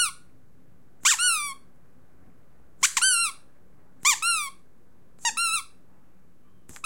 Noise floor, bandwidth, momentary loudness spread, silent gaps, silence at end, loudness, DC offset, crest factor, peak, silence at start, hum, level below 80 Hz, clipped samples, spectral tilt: -61 dBFS; 16.5 kHz; 10 LU; none; 1.2 s; -23 LUFS; 0.6%; 22 dB; -6 dBFS; 0 s; none; -68 dBFS; under 0.1%; 3.5 dB/octave